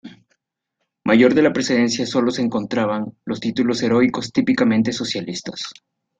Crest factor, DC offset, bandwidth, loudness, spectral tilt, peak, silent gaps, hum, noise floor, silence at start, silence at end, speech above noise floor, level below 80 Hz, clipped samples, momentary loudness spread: 18 dB; under 0.1%; 9 kHz; -19 LUFS; -5 dB/octave; -2 dBFS; none; none; -77 dBFS; 0.05 s; 0.45 s; 58 dB; -58 dBFS; under 0.1%; 13 LU